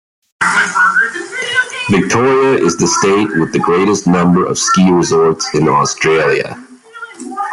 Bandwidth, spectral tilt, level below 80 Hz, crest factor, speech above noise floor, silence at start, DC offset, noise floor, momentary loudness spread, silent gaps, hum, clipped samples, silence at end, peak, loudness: 12 kHz; -4.5 dB/octave; -48 dBFS; 12 dB; 21 dB; 0.4 s; under 0.1%; -32 dBFS; 10 LU; none; none; under 0.1%; 0 s; 0 dBFS; -12 LUFS